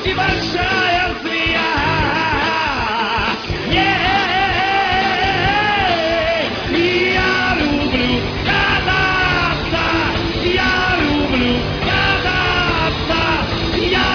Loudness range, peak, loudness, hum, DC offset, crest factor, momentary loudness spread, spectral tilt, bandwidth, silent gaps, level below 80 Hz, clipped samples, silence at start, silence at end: 1 LU; -2 dBFS; -16 LUFS; none; under 0.1%; 14 dB; 3 LU; -5 dB/octave; 5.4 kHz; none; -30 dBFS; under 0.1%; 0 s; 0 s